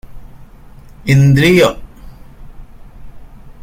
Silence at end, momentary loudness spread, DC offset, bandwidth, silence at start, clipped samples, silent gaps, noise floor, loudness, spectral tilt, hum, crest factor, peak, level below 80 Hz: 0.1 s; 17 LU; under 0.1%; 15.5 kHz; 0.1 s; under 0.1%; none; -37 dBFS; -11 LUFS; -6.5 dB/octave; none; 16 dB; 0 dBFS; -36 dBFS